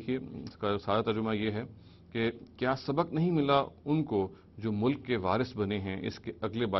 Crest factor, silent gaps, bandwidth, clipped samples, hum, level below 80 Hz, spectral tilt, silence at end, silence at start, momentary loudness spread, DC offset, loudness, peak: 20 dB; none; 6.2 kHz; under 0.1%; none; -60 dBFS; -8 dB/octave; 0 s; 0 s; 10 LU; under 0.1%; -32 LUFS; -12 dBFS